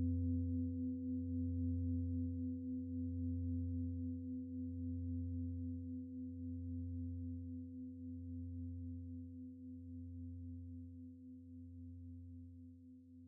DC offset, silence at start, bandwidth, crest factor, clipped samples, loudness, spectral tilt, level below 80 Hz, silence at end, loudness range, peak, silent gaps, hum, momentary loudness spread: under 0.1%; 0 s; 0.5 kHz; 14 dB; under 0.1%; -45 LUFS; -13 dB/octave; -66 dBFS; 0 s; 11 LU; -30 dBFS; none; none; 14 LU